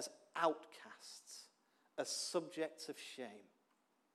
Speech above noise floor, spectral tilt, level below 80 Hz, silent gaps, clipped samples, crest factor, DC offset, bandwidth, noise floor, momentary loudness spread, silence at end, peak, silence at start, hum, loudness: 36 dB; -2 dB/octave; under -90 dBFS; none; under 0.1%; 24 dB; under 0.1%; 15 kHz; -80 dBFS; 17 LU; 0.7 s; -22 dBFS; 0 s; none; -44 LUFS